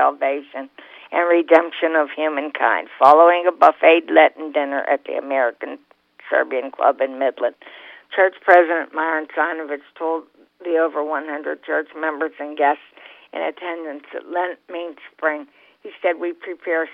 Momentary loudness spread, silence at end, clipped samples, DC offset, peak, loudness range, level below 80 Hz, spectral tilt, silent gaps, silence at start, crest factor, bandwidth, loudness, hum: 17 LU; 0 s; under 0.1%; under 0.1%; 0 dBFS; 10 LU; -78 dBFS; -4.5 dB/octave; none; 0 s; 20 dB; 5.8 kHz; -19 LUFS; none